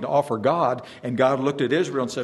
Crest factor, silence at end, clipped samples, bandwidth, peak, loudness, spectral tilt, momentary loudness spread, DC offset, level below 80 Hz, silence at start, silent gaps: 18 dB; 0 s; under 0.1%; 12.5 kHz; -6 dBFS; -23 LUFS; -6 dB/octave; 5 LU; under 0.1%; -66 dBFS; 0 s; none